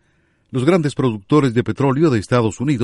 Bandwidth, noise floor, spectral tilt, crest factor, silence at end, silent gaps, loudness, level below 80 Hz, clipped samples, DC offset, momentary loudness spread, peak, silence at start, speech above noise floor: 11.5 kHz; -60 dBFS; -7 dB/octave; 16 dB; 0 s; none; -17 LUFS; -50 dBFS; under 0.1%; under 0.1%; 4 LU; -2 dBFS; 0.55 s; 44 dB